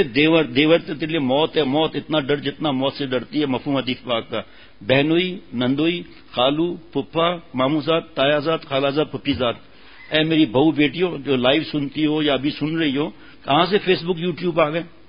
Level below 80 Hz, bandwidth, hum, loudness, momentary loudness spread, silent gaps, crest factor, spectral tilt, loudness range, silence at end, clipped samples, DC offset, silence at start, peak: -52 dBFS; 5.4 kHz; none; -20 LUFS; 7 LU; none; 18 dB; -10.5 dB/octave; 2 LU; 0.2 s; under 0.1%; 0.5%; 0 s; -2 dBFS